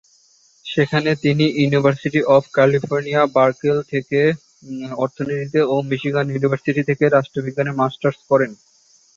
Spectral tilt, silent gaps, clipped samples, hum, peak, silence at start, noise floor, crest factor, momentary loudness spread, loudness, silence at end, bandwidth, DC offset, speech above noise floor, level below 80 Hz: -7 dB/octave; none; under 0.1%; none; -2 dBFS; 0.65 s; -55 dBFS; 18 dB; 9 LU; -18 LUFS; 0.65 s; 7.6 kHz; under 0.1%; 38 dB; -60 dBFS